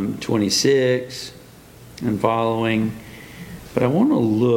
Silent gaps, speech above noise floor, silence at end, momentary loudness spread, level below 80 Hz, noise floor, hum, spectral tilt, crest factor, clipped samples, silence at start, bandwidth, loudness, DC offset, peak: none; 25 dB; 0 s; 20 LU; -52 dBFS; -44 dBFS; none; -5 dB/octave; 18 dB; under 0.1%; 0 s; 17 kHz; -20 LUFS; under 0.1%; -2 dBFS